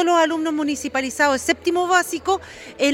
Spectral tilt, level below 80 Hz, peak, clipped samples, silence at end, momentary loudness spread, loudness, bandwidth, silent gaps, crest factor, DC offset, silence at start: -2.5 dB/octave; -54 dBFS; -4 dBFS; under 0.1%; 0 s; 6 LU; -20 LUFS; 17 kHz; none; 16 dB; under 0.1%; 0 s